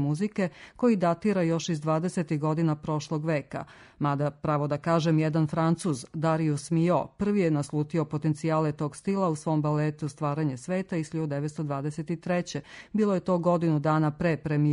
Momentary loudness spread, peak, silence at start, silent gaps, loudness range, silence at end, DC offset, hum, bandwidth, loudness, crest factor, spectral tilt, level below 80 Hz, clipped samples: 7 LU; -12 dBFS; 0 s; none; 3 LU; 0 s; under 0.1%; none; 11 kHz; -28 LUFS; 16 dB; -7.5 dB/octave; -60 dBFS; under 0.1%